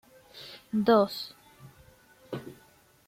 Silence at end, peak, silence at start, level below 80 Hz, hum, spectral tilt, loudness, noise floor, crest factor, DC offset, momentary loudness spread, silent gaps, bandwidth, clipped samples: 0.55 s; -12 dBFS; 0.35 s; -68 dBFS; none; -6 dB/octave; -27 LUFS; -60 dBFS; 20 dB; under 0.1%; 24 LU; none; 16.5 kHz; under 0.1%